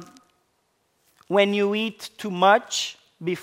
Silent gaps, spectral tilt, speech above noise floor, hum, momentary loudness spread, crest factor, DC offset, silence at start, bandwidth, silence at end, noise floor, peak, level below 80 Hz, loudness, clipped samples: none; -4 dB/octave; 48 dB; none; 13 LU; 22 dB; under 0.1%; 0 s; 16 kHz; 0 s; -70 dBFS; -4 dBFS; -76 dBFS; -23 LUFS; under 0.1%